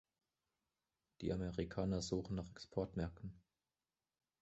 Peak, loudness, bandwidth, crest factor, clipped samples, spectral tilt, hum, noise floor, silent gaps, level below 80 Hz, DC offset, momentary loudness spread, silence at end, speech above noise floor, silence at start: -26 dBFS; -44 LUFS; 8 kHz; 20 dB; under 0.1%; -7 dB/octave; none; under -90 dBFS; none; -60 dBFS; under 0.1%; 6 LU; 1 s; over 47 dB; 1.2 s